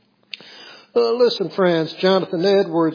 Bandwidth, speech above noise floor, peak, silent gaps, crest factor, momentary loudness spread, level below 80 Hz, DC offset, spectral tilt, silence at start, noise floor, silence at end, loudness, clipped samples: 5.2 kHz; 25 dB; -4 dBFS; none; 16 dB; 19 LU; -82 dBFS; under 0.1%; -6.5 dB/octave; 0.5 s; -42 dBFS; 0 s; -18 LUFS; under 0.1%